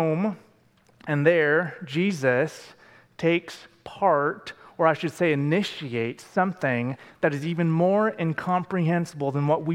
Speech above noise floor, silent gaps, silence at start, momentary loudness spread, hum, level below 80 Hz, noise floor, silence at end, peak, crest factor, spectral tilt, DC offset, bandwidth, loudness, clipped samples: 36 dB; none; 0 s; 10 LU; none; -70 dBFS; -60 dBFS; 0 s; -6 dBFS; 20 dB; -7 dB/octave; under 0.1%; 13 kHz; -25 LUFS; under 0.1%